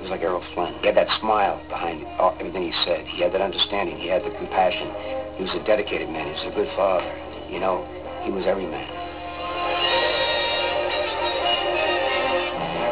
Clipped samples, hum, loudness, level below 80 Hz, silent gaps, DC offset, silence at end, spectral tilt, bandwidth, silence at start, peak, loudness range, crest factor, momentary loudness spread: under 0.1%; none; -23 LUFS; -46 dBFS; none; 0.4%; 0 s; -8 dB/octave; 4 kHz; 0 s; -6 dBFS; 4 LU; 18 dB; 10 LU